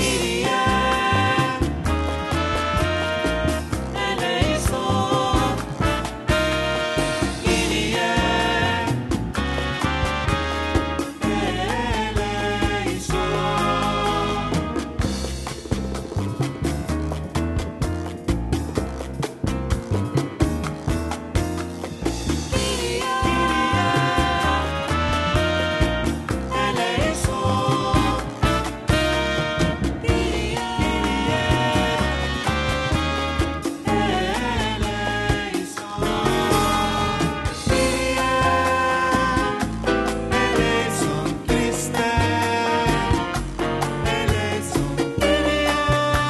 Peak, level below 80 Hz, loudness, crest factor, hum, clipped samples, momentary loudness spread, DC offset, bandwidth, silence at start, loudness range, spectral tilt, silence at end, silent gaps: -4 dBFS; -32 dBFS; -22 LUFS; 16 dB; none; under 0.1%; 7 LU; under 0.1%; 13 kHz; 0 s; 5 LU; -5 dB/octave; 0 s; none